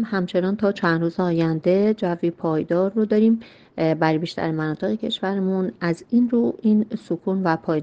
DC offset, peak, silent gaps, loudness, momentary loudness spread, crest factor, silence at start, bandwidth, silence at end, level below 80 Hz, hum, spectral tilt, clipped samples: under 0.1%; -4 dBFS; none; -22 LUFS; 6 LU; 16 dB; 0 s; 8.2 kHz; 0 s; -62 dBFS; none; -8 dB/octave; under 0.1%